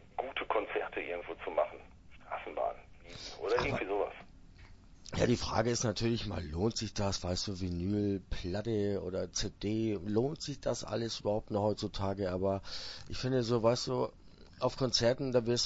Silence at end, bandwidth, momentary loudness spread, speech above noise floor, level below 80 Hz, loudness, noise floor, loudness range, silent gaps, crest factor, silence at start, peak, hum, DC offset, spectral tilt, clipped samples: 0 s; 8 kHz; 10 LU; 21 dB; -52 dBFS; -35 LUFS; -55 dBFS; 4 LU; none; 20 dB; 0 s; -14 dBFS; none; under 0.1%; -5 dB/octave; under 0.1%